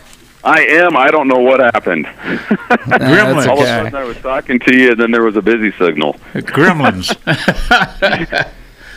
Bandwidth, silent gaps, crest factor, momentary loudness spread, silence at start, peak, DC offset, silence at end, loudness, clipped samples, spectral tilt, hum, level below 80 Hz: 16 kHz; none; 12 dB; 10 LU; 0.45 s; 0 dBFS; under 0.1%; 0 s; -11 LUFS; 0.5%; -5.5 dB/octave; none; -34 dBFS